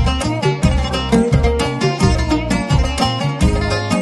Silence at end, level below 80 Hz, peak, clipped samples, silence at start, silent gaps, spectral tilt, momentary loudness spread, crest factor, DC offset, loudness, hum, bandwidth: 0 s; -22 dBFS; 0 dBFS; under 0.1%; 0 s; none; -6 dB/octave; 3 LU; 14 dB; under 0.1%; -16 LUFS; none; 12.5 kHz